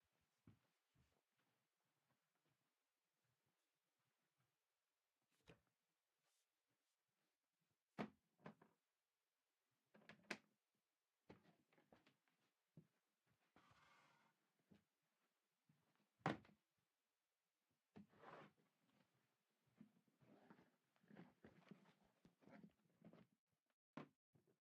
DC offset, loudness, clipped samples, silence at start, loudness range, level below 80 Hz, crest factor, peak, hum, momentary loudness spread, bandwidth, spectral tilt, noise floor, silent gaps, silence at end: under 0.1%; -58 LUFS; under 0.1%; 0.45 s; 6 LU; under -90 dBFS; 38 dB; -28 dBFS; none; 18 LU; 6.4 kHz; -4.5 dB/octave; under -90 dBFS; 23.39-23.47 s, 23.62-23.66 s, 23.73-23.94 s, 24.16-24.33 s; 0.25 s